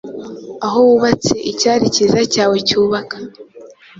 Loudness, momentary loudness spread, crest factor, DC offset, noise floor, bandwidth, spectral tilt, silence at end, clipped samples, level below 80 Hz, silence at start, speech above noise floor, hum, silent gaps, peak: -14 LUFS; 18 LU; 14 dB; under 0.1%; -40 dBFS; 7.8 kHz; -4 dB/octave; 0.3 s; under 0.1%; -50 dBFS; 0.05 s; 26 dB; none; none; 0 dBFS